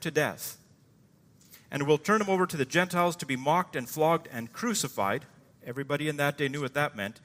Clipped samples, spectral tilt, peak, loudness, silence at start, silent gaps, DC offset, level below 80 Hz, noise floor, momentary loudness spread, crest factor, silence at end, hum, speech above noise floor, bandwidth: under 0.1%; -4.5 dB/octave; -10 dBFS; -29 LUFS; 0 s; none; under 0.1%; -72 dBFS; -61 dBFS; 13 LU; 20 dB; 0.1 s; none; 32 dB; 16 kHz